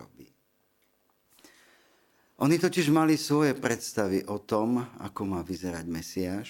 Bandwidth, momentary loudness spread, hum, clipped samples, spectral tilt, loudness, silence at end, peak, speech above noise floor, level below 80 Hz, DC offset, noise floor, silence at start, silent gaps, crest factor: 17 kHz; 11 LU; none; under 0.1%; -5.5 dB/octave; -28 LUFS; 0 s; -8 dBFS; 44 dB; -62 dBFS; under 0.1%; -71 dBFS; 0 s; none; 20 dB